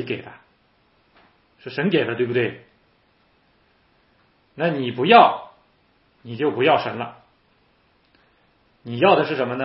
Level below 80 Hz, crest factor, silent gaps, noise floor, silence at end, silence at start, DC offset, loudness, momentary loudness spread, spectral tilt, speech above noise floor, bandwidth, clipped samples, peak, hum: -70 dBFS; 24 dB; none; -61 dBFS; 0 s; 0 s; under 0.1%; -19 LUFS; 20 LU; -10 dB/octave; 42 dB; 5.8 kHz; under 0.1%; 0 dBFS; none